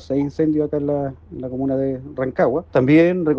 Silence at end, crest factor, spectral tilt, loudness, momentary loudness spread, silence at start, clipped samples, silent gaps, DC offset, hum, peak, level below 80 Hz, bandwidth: 0 s; 16 dB; -9 dB/octave; -19 LUFS; 12 LU; 0 s; under 0.1%; none; under 0.1%; none; -4 dBFS; -48 dBFS; 6.6 kHz